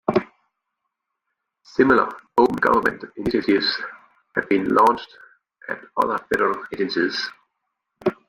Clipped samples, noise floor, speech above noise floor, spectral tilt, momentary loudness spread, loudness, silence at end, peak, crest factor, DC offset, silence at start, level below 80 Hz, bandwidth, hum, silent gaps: under 0.1%; -80 dBFS; 59 dB; -5.5 dB/octave; 12 LU; -21 LUFS; 0.15 s; -4 dBFS; 20 dB; under 0.1%; 0.1 s; -58 dBFS; 16 kHz; none; none